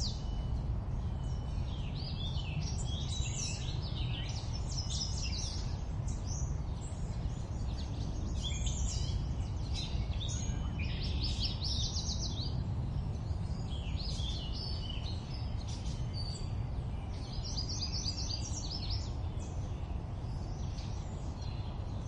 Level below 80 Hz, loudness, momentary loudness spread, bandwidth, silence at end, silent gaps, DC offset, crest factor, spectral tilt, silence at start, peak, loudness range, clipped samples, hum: -40 dBFS; -38 LUFS; 5 LU; 10.5 kHz; 0 s; none; under 0.1%; 16 dB; -4.5 dB/octave; 0 s; -20 dBFS; 3 LU; under 0.1%; none